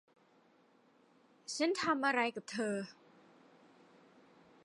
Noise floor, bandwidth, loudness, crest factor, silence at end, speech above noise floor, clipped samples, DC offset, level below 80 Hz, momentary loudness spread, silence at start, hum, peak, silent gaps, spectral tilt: -69 dBFS; 11.5 kHz; -35 LUFS; 22 dB; 1.7 s; 33 dB; under 0.1%; under 0.1%; -86 dBFS; 14 LU; 1.5 s; none; -18 dBFS; none; -3.5 dB/octave